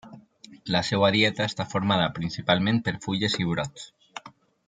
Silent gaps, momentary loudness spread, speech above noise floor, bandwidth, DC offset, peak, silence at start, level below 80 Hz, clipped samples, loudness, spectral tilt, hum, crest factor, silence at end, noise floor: none; 20 LU; 26 dB; 9.4 kHz; under 0.1%; -4 dBFS; 0.05 s; -58 dBFS; under 0.1%; -25 LUFS; -5 dB/octave; none; 22 dB; 0.4 s; -51 dBFS